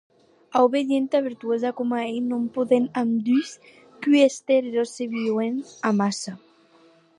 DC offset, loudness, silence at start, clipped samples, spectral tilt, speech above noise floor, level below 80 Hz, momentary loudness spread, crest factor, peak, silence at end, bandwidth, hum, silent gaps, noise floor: under 0.1%; -23 LUFS; 0.5 s; under 0.1%; -5 dB/octave; 34 dB; -78 dBFS; 8 LU; 18 dB; -6 dBFS; 0.8 s; 11 kHz; none; none; -56 dBFS